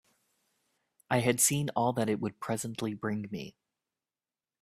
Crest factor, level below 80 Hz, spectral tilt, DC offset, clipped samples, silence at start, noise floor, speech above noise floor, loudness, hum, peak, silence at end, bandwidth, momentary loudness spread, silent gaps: 22 dB; -68 dBFS; -4 dB/octave; under 0.1%; under 0.1%; 1.1 s; under -90 dBFS; over 59 dB; -30 LUFS; none; -12 dBFS; 1.1 s; 15.5 kHz; 13 LU; none